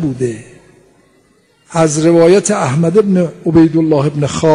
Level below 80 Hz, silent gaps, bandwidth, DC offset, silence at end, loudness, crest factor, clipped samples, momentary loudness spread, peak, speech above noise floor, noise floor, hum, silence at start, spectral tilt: -46 dBFS; none; 11 kHz; under 0.1%; 0 s; -12 LUFS; 12 dB; under 0.1%; 11 LU; 0 dBFS; 41 dB; -52 dBFS; none; 0 s; -6.5 dB/octave